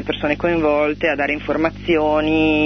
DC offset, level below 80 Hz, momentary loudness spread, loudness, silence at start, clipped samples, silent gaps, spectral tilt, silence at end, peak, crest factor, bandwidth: under 0.1%; -38 dBFS; 4 LU; -18 LUFS; 0 s; under 0.1%; none; -7 dB/octave; 0 s; -4 dBFS; 14 dB; 6.4 kHz